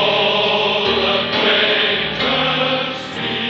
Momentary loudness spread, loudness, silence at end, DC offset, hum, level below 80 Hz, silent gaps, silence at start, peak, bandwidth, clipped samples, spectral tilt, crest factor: 7 LU; -15 LUFS; 0 s; under 0.1%; none; -48 dBFS; none; 0 s; -4 dBFS; 8 kHz; under 0.1%; -4.5 dB/octave; 14 dB